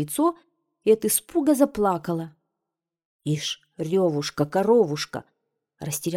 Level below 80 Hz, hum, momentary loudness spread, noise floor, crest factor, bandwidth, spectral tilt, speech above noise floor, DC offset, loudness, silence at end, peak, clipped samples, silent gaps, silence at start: -60 dBFS; none; 12 LU; -86 dBFS; 18 dB; 17 kHz; -5 dB/octave; 63 dB; under 0.1%; -24 LUFS; 0 s; -6 dBFS; under 0.1%; 3.05-3.19 s; 0 s